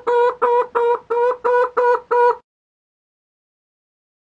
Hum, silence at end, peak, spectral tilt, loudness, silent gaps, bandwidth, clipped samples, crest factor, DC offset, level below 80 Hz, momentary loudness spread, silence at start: none; 1.85 s; -4 dBFS; -4 dB/octave; -17 LUFS; none; 7.4 kHz; under 0.1%; 16 dB; under 0.1%; -66 dBFS; 3 LU; 0.05 s